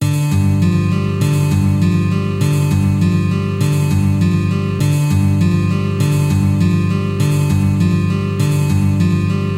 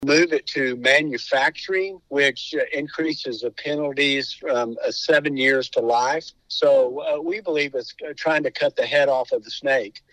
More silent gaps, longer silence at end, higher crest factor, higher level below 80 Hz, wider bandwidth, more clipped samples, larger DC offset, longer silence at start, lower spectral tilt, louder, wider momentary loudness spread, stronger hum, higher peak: neither; second, 0 s vs 0.15 s; second, 10 dB vs 20 dB; first, -38 dBFS vs -66 dBFS; first, 15.5 kHz vs 10.5 kHz; neither; neither; about the same, 0 s vs 0 s; first, -7 dB/octave vs -3.5 dB/octave; first, -15 LUFS vs -21 LUFS; second, 2 LU vs 8 LU; neither; about the same, -4 dBFS vs -2 dBFS